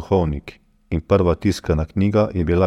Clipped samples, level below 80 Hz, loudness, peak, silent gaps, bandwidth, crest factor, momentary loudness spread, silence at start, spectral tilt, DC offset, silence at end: under 0.1%; -32 dBFS; -20 LUFS; -4 dBFS; none; 13 kHz; 16 dB; 10 LU; 0 s; -8 dB/octave; under 0.1%; 0 s